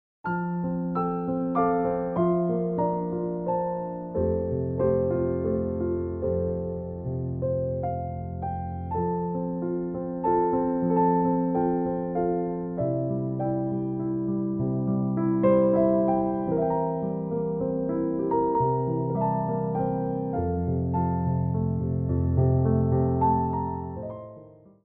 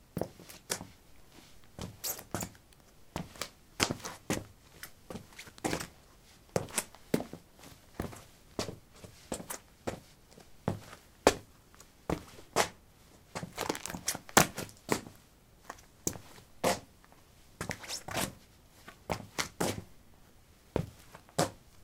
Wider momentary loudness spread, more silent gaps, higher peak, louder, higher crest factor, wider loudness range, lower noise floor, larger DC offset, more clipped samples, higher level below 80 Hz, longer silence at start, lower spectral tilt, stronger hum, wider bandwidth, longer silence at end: second, 8 LU vs 21 LU; neither; second, -10 dBFS vs 0 dBFS; first, -26 LUFS vs -36 LUFS; second, 16 dB vs 38 dB; second, 4 LU vs 8 LU; second, -49 dBFS vs -60 dBFS; neither; neither; first, -46 dBFS vs -58 dBFS; about the same, 0.25 s vs 0.15 s; first, -12 dB/octave vs -3 dB/octave; neither; second, 3.1 kHz vs 18 kHz; first, 0.3 s vs 0 s